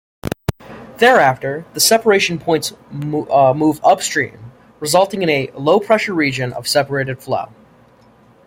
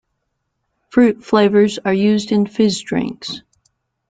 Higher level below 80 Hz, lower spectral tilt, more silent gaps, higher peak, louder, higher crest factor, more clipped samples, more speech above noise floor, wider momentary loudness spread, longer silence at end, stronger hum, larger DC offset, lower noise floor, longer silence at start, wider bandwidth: first, -50 dBFS vs -56 dBFS; second, -3.5 dB/octave vs -6 dB/octave; neither; about the same, 0 dBFS vs -2 dBFS; about the same, -16 LUFS vs -16 LUFS; about the same, 16 dB vs 16 dB; neither; second, 33 dB vs 57 dB; about the same, 13 LU vs 12 LU; first, 1 s vs 0.7 s; neither; neither; second, -49 dBFS vs -72 dBFS; second, 0.25 s vs 0.95 s; first, 16.5 kHz vs 9.2 kHz